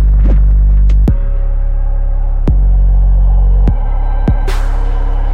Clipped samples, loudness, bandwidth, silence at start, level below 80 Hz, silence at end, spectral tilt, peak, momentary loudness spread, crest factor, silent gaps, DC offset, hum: under 0.1%; -14 LUFS; 4 kHz; 0 s; -8 dBFS; 0 s; -8.5 dB/octave; 0 dBFS; 7 LU; 8 dB; none; under 0.1%; none